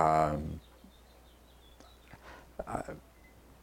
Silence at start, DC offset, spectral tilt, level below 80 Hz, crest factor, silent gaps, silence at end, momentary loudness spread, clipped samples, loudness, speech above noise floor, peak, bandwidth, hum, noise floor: 0 s; under 0.1%; -7 dB/octave; -52 dBFS; 26 dB; none; 0.6 s; 28 LU; under 0.1%; -35 LUFS; 27 dB; -10 dBFS; 16.5 kHz; none; -58 dBFS